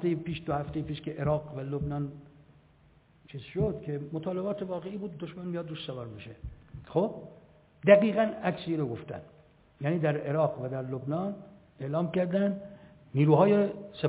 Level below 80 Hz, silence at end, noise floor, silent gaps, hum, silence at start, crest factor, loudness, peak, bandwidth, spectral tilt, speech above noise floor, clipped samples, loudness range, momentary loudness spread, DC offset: -56 dBFS; 0 s; -61 dBFS; none; none; 0 s; 24 dB; -30 LUFS; -6 dBFS; 4 kHz; -7 dB/octave; 32 dB; under 0.1%; 8 LU; 21 LU; under 0.1%